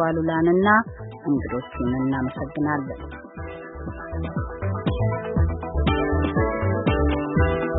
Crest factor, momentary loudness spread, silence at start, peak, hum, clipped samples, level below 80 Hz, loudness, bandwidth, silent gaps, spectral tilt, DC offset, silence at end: 18 dB; 15 LU; 0 s; -6 dBFS; none; under 0.1%; -32 dBFS; -23 LUFS; 4 kHz; none; -12 dB/octave; under 0.1%; 0 s